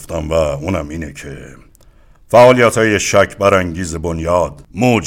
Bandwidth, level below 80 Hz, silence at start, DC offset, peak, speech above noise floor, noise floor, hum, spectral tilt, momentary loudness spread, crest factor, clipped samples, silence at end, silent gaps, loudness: 16.5 kHz; -38 dBFS; 0 s; under 0.1%; 0 dBFS; 32 dB; -45 dBFS; none; -5 dB/octave; 18 LU; 14 dB; under 0.1%; 0 s; none; -13 LUFS